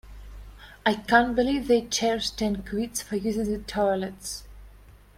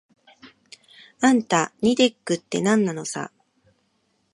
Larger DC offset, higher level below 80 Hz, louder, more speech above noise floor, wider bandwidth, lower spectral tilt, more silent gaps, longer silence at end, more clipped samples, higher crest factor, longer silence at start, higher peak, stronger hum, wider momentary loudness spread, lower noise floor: neither; first, -46 dBFS vs -68 dBFS; second, -26 LUFS vs -22 LUFS; second, 25 dB vs 48 dB; first, 16 kHz vs 11.5 kHz; about the same, -3.5 dB/octave vs -4 dB/octave; neither; second, 0.25 s vs 1.05 s; neither; about the same, 22 dB vs 20 dB; second, 0.05 s vs 0.45 s; about the same, -4 dBFS vs -4 dBFS; first, 50 Hz at -45 dBFS vs none; first, 15 LU vs 11 LU; second, -51 dBFS vs -69 dBFS